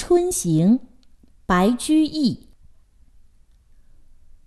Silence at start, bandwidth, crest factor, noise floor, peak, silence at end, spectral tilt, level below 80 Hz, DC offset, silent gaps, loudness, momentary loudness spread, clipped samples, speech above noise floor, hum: 0 s; 12.5 kHz; 16 dB; -52 dBFS; -6 dBFS; 2.1 s; -5.5 dB/octave; -46 dBFS; under 0.1%; none; -20 LUFS; 6 LU; under 0.1%; 34 dB; none